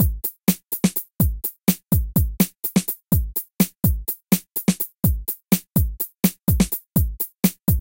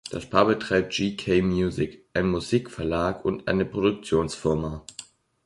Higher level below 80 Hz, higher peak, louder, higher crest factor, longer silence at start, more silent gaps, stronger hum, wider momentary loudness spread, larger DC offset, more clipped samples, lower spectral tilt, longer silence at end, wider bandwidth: first, -30 dBFS vs -46 dBFS; first, -2 dBFS vs -6 dBFS; first, -22 LUFS vs -25 LUFS; about the same, 18 dB vs 20 dB; about the same, 0 s vs 0.05 s; neither; neither; second, 3 LU vs 7 LU; neither; neither; about the same, -5.5 dB/octave vs -6 dB/octave; second, 0 s vs 0.45 s; first, 17.5 kHz vs 11.5 kHz